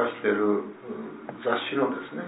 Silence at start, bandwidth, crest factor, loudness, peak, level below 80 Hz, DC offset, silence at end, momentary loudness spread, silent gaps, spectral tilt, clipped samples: 0 s; 4 kHz; 20 dB; -28 LUFS; -8 dBFS; -78 dBFS; under 0.1%; 0 s; 13 LU; none; -9 dB/octave; under 0.1%